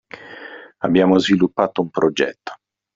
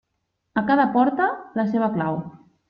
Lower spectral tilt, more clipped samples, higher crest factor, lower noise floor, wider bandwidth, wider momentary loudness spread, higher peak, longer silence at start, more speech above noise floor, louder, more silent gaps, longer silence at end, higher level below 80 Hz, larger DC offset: second, -4.5 dB/octave vs -9.5 dB/octave; neither; about the same, 18 dB vs 18 dB; second, -38 dBFS vs -76 dBFS; first, 7.6 kHz vs 5.4 kHz; first, 21 LU vs 10 LU; first, -2 dBFS vs -6 dBFS; second, 0.15 s vs 0.55 s; second, 21 dB vs 55 dB; first, -18 LUFS vs -22 LUFS; neither; about the same, 0.4 s vs 0.35 s; first, -58 dBFS vs -64 dBFS; neither